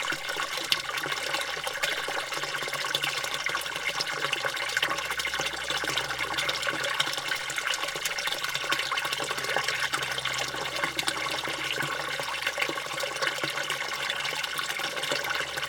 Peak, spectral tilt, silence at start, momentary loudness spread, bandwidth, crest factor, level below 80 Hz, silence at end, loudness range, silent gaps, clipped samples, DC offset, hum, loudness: -4 dBFS; -0.5 dB/octave; 0 s; 3 LU; 19.5 kHz; 26 dB; -60 dBFS; 0 s; 1 LU; none; under 0.1%; under 0.1%; none; -28 LUFS